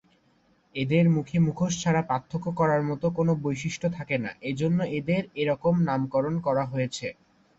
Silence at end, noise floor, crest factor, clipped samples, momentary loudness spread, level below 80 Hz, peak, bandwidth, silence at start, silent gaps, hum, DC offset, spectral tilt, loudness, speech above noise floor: 0.45 s; -65 dBFS; 16 dB; under 0.1%; 7 LU; -58 dBFS; -10 dBFS; 8 kHz; 0.75 s; none; none; under 0.1%; -6.5 dB/octave; -26 LUFS; 39 dB